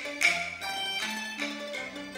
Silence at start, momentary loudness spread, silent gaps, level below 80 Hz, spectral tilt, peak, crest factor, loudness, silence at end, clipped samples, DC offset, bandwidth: 0 s; 11 LU; none; -68 dBFS; -1 dB/octave; -10 dBFS; 22 dB; -30 LUFS; 0 s; under 0.1%; under 0.1%; 16 kHz